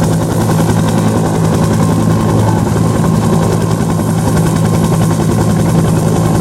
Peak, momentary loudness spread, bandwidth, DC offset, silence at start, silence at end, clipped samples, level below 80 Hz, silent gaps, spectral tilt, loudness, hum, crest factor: 0 dBFS; 2 LU; 15.5 kHz; under 0.1%; 0 s; 0 s; under 0.1%; -28 dBFS; none; -6.5 dB/octave; -12 LUFS; none; 10 dB